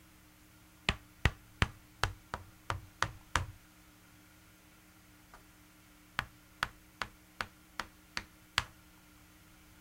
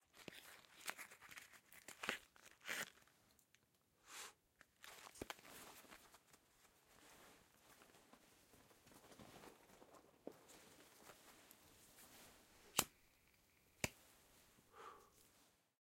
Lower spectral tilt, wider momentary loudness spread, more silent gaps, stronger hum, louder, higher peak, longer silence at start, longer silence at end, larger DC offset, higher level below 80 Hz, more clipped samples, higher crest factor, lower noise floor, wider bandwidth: first, -3.5 dB/octave vs -1.5 dB/octave; first, 24 LU vs 20 LU; neither; neither; first, -39 LUFS vs -52 LUFS; first, -8 dBFS vs -14 dBFS; first, 0.9 s vs 0 s; first, 1.1 s vs 0.25 s; neither; first, -50 dBFS vs -80 dBFS; neither; second, 34 dB vs 42 dB; second, -61 dBFS vs -79 dBFS; about the same, 16 kHz vs 16.5 kHz